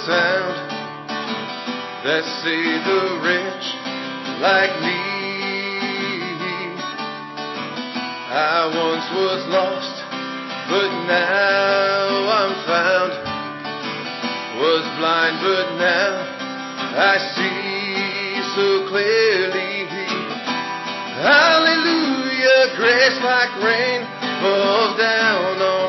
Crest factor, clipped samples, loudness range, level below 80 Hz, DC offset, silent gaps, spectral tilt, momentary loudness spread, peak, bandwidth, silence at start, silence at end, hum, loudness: 18 dB; under 0.1%; 6 LU; -70 dBFS; under 0.1%; none; -3.5 dB/octave; 12 LU; -2 dBFS; 6.2 kHz; 0 s; 0 s; none; -19 LUFS